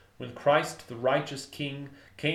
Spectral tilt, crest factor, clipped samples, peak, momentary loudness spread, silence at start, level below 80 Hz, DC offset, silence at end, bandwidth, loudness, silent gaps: -5 dB/octave; 22 dB; under 0.1%; -8 dBFS; 17 LU; 0.2 s; -68 dBFS; under 0.1%; 0 s; 15 kHz; -29 LUFS; none